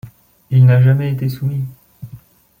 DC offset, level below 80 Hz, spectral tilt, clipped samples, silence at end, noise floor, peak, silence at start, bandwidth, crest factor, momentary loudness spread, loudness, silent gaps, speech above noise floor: under 0.1%; -52 dBFS; -9.5 dB/octave; under 0.1%; 0.45 s; -41 dBFS; -2 dBFS; 0.05 s; 16 kHz; 12 dB; 26 LU; -14 LUFS; none; 28 dB